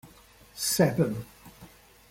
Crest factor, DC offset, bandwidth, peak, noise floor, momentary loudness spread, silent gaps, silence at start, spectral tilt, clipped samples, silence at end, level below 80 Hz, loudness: 20 dB; under 0.1%; 16.5 kHz; -10 dBFS; -55 dBFS; 23 LU; none; 0.05 s; -4.5 dB/octave; under 0.1%; 0.45 s; -58 dBFS; -27 LUFS